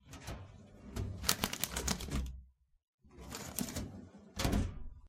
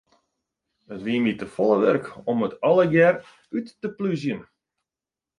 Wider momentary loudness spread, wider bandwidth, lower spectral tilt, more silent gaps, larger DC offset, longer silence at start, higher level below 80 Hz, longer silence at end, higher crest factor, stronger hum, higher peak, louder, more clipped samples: first, 19 LU vs 15 LU; first, 16.5 kHz vs 10.5 kHz; second, -3.5 dB/octave vs -7.5 dB/octave; first, 2.84-2.98 s vs none; neither; second, 0.05 s vs 0.9 s; first, -46 dBFS vs -64 dBFS; second, 0 s vs 0.95 s; first, 34 dB vs 18 dB; neither; about the same, -6 dBFS vs -6 dBFS; second, -39 LUFS vs -23 LUFS; neither